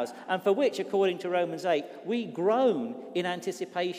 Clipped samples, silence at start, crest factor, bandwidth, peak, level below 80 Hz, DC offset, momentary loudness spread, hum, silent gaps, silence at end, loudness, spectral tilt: under 0.1%; 0 s; 14 dB; 15.5 kHz; -14 dBFS; -88 dBFS; under 0.1%; 8 LU; none; none; 0 s; -29 LUFS; -5 dB/octave